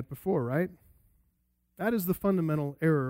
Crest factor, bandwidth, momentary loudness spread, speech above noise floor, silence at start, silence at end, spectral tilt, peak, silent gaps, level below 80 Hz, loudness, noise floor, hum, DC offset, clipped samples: 16 dB; 16 kHz; 5 LU; 45 dB; 0 s; 0 s; -8 dB/octave; -14 dBFS; none; -60 dBFS; -30 LUFS; -74 dBFS; none; under 0.1%; under 0.1%